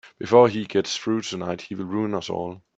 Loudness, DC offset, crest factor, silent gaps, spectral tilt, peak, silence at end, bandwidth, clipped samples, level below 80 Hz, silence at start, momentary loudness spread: -23 LUFS; under 0.1%; 20 dB; none; -5 dB/octave; -2 dBFS; 0.2 s; 8 kHz; under 0.1%; -64 dBFS; 0.05 s; 13 LU